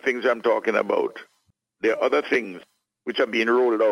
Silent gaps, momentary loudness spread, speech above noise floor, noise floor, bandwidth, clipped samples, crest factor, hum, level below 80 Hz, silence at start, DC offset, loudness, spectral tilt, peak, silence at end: none; 16 LU; 45 dB; -67 dBFS; 11.5 kHz; under 0.1%; 16 dB; none; -74 dBFS; 0.05 s; under 0.1%; -23 LUFS; -4.5 dB/octave; -6 dBFS; 0 s